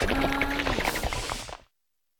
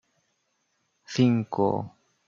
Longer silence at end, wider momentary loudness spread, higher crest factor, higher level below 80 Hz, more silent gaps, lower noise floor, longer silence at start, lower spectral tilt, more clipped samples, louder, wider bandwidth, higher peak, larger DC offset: first, 0.6 s vs 0.4 s; about the same, 13 LU vs 11 LU; about the same, 18 dB vs 20 dB; first, -38 dBFS vs -68 dBFS; neither; first, -81 dBFS vs -74 dBFS; second, 0 s vs 1.1 s; second, -4 dB/octave vs -7 dB/octave; neither; about the same, -28 LUFS vs -26 LUFS; first, 18 kHz vs 7.6 kHz; about the same, -10 dBFS vs -10 dBFS; neither